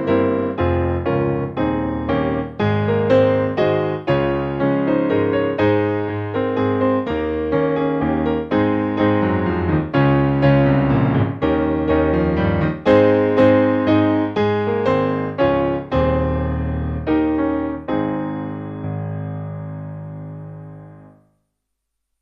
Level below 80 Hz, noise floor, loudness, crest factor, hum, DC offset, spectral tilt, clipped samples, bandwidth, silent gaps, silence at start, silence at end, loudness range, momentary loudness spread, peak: -36 dBFS; -76 dBFS; -18 LUFS; 16 dB; 50 Hz at -50 dBFS; under 0.1%; -9.5 dB/octave; under 0.1%; 6.4 kHz; none; 0 s; 1.15 s; 8 LU; 12 LU; -2 dBFS